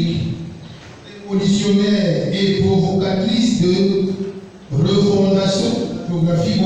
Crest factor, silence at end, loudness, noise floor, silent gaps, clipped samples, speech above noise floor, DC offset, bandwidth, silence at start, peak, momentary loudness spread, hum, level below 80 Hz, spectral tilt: 12 dB; 0 s; -17 LUFS; -37 dBFS; none; under 0.1%; 21 dB; under 0.1%; 9.4 kHz; 0 s; -4 dBFS; 17 LU; none; -44 dBFS; -6.5 dB/octave